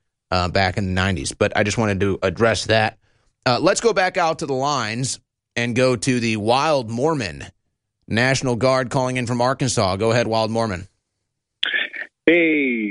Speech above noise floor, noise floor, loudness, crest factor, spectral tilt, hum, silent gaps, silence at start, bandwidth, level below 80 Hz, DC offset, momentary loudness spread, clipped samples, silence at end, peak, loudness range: 58 dB; -77 dBFS; -20 LUFS; 18 dB; -4.5 dB/octave; none; none; 0.3 s; 11.5 kHz; -48 dBFS; under 0.1%; 8 LU; under 0.1%; 0 s; -2 dBFS; 2 LU